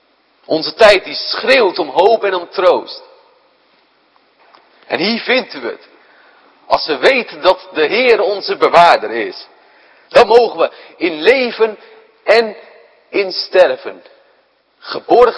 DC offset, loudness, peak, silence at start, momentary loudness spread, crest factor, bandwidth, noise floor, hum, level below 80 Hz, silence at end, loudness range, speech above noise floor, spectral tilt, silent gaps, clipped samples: under 0.1%; -13 LUFS; 0 dBFS; 0.5 s; 16 LU; 14 dB; 11 kHz; -56 dBFS; none; -52 dBFS; 0 s; 7 LU; 43 dB; -4 dB/octave; none; 0.6%